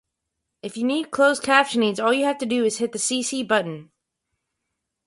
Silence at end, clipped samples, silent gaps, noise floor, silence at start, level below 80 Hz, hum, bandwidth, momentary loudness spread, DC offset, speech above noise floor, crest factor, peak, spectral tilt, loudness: 1.25 s; under 0.1%; none; -80 dBFS; 0.65 s; -70 dBFS; none; 11.5 kHz; 13 LU; under 0.1%; 59 dB; 20 dB; -4 dBFS; -3 dB/octave; -21 LUFS